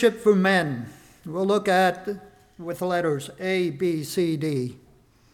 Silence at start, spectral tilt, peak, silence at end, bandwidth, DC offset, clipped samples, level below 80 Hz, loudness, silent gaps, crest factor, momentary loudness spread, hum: 0 s; -6 dB/octave; -6 dBFS; 0.55 s; 17.5 kHz; under 0.1%; under 0.1%; -62 dBFS; -24 LUFS; none; 18 dB; 15 LU; none